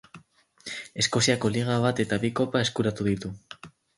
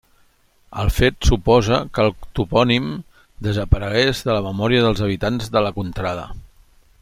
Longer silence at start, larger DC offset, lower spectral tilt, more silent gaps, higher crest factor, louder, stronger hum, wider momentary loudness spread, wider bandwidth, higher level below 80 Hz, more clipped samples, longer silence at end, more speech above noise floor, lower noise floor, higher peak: second, 0.15 s vs 0.7 s; neither; second, -4.5 dB/octave vs -6 dB/octave; neither; about the same, 20 dB vs 18 dB; second, -26 LUFS vs -19 LUFS; neither; first, 19 LU vs 11 LU; second, 11.5 kHz vs 16 kHz; second, -56 dBFS vs -30 dBFS; neither; second, 0.3 s vs 0.55 s; second, 30 dB vs 38 dB; about the same, -56 dBFS vs -57 dBFS; second, -8 dBFS vs -2 dBFS